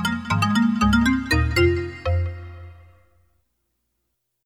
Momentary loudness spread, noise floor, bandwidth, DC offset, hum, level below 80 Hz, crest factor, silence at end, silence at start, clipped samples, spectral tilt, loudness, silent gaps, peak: 10 LU; -76 dBFS; 16.5 kHz; under 0.1%; none; -34 dBFS; 16 dB; 1.7 s; 0 s; under 0.1%; -6 dB/octave; -21 LUFS; none; -6 dBFS